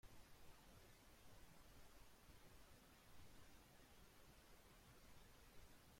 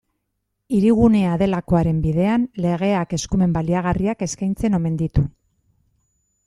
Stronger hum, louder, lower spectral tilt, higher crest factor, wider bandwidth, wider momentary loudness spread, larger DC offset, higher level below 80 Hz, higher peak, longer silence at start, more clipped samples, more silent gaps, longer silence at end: neither; second, -68 LUFS vs -20 LUFS; second, -3.5 dB/octave vs -7 dB/octave; about the same, 14 dB vs 16 dB; first, 16.5 kHz vs 11.5 kHz; second, 1 LU vs 7 LU; neither; second, -72 dBFS vs -36 dBFS; second, -50 dBFS vs -2 dBFS; second, 0.05 s vs 0.7 s; neither; neither; second, 0 s vs 1.2 s